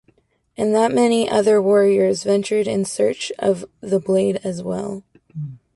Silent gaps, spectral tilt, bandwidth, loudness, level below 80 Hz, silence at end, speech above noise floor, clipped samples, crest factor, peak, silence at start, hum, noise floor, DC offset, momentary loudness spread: none; -5.5 dB/octave; 11.5 kHz; -19 LUFS; -60 dBFS; 0.2 s; 42 dB; under 0.1%; 14 dB; -4 dBFS; 0.6 s; none; -60 dBFS; under 0.1%; 15 LU